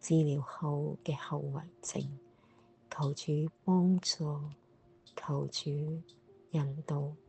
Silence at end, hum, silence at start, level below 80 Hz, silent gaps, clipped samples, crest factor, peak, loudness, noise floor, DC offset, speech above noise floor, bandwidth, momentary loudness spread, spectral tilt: 0.1 s; none; 0.05 s; -72 dBFS; none; under 0.1%; 16 dB; -18 dBFS; -35 LUFS; -64 dBFS; under 0.1%; 30 dB; 8.8 kHz; 14 LU; -6 dB/octave